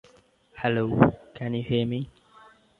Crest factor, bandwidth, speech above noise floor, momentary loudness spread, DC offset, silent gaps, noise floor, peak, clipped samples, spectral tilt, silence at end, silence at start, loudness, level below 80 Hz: 24 dB; 4.4 kHz; 35 dB; 13 LU; under 0.1%; none; -59 dBFS; -4 dBFS; under 0.1%; -9 dB/octave; 0.75 s; 0.55 s; -26 LUFS; -52 dBFS